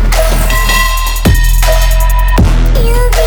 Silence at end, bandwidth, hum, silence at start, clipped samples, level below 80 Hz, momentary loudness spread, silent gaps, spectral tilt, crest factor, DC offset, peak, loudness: 0 s; over 20 kHz; none; 0 s; 0.4%; -8 dBFS; 2 LU; none; -4 dB/octave; 8 dB; under 0.1%; 0 dBFS; -11 LUFS